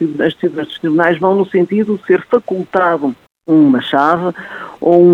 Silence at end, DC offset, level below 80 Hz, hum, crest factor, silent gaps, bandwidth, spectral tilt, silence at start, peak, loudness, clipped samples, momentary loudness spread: 0 s; under 0.1%; -58 dBFS; none; 12 dB; none; 5.4 kHz; -8 dB/octave; 0 s; 0 dBFS; -14 LUFS; under 0.1%; 10 LU